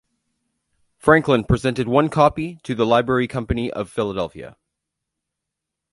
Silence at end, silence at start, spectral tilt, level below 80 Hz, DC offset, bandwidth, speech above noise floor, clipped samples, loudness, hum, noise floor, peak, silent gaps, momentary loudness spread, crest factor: 1.45 s; 1.05 s; -6.5 dB/octave; -40 dBFS; under 0.1%; 11.5 kHz; 64 dB; under 0.1%; -20 LUFS; none; -83 dBFS; 0 dBFS; none; 12 LU; 20 dB